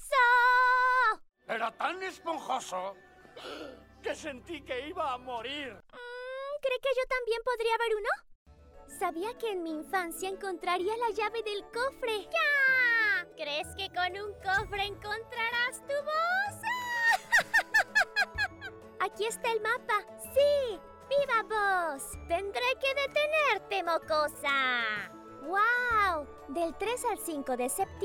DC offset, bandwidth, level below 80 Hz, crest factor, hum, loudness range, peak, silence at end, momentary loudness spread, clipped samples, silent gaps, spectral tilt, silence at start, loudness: under 0.1%; 19 kHz; -58 dBFS; 18 dB; none; 9 LU; -14 dBFS; 0 s; 14 LU; under 0.1%; 8.35-8.46 s; -2 dB/octave; 0 s; -30 LUFS